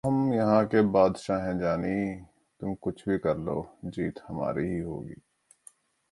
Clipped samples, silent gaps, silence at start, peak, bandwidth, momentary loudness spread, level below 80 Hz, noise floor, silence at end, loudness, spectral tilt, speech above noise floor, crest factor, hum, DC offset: under 0.1%; none; 0.05 s; -8 dBFS; 11.5 kHz; 14 LU; -54 dBFS; -58 dBFS; 0.95 s; -28 LUFS; -8 dB/octave; 30 dB; 20 dB; none; under 0.1%